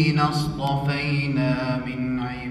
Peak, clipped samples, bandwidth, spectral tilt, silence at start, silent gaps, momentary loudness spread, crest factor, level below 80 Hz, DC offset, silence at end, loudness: -8 dBFS; under 0.1%; 13 kHz; -6.5 dB/octave; 0 s; none; 5 LU; 16 dB; -44 dBFS; under 0.1%; 0 s; -24 LUFS